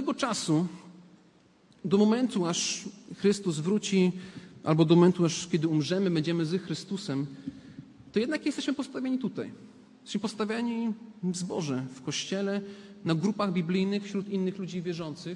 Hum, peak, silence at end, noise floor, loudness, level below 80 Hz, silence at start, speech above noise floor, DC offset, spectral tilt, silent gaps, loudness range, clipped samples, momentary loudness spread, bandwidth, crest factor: none; -10 dBFS; 0 s; -61 dBFS; -29 LUFS; -72 dBFS; 0 s; 32 dB; under 0.1%; -5.5 dB/octave; none; 7 LU; under 0.1%; 12 LU; 11.5 kHz; 20 dB